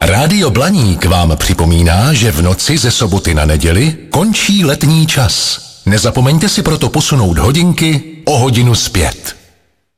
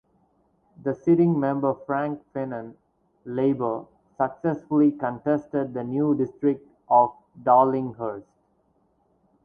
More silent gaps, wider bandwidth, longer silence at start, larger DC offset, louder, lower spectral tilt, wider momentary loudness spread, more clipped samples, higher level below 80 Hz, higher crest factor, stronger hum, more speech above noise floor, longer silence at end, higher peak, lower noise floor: neither; first, 16 kHz vs 3.5 kHz; second, 0 s vs 0.85 s; neither; first, -10 LUFS vs -24 LUFS; second, -4.5 dB/octave vs -11 dB/octave; second, 4 LU vs 13 LU; neither; first, -22 dBFS vs -66 dBFS; second, 10 dB vs 20 dB; neither; about the same, 43 dB vs 43 dB; second, 0.65 s vs 1.25 s; first, 0 dBFS vs -6 dBFS; second, -53 dBFS vs -67 dBFS